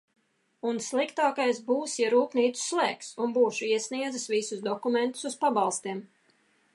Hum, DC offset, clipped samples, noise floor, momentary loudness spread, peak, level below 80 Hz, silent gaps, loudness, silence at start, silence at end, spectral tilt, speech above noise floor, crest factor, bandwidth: none; under 0.1%; under 0.1%; -67 dBFS; 7 LU; -12 dBFS; -86 dBFS; none; -28 LUFS; 0.65 s; 0.7 s; -3 dB/octave; 39 dB; 16 dB; 11.5 kHz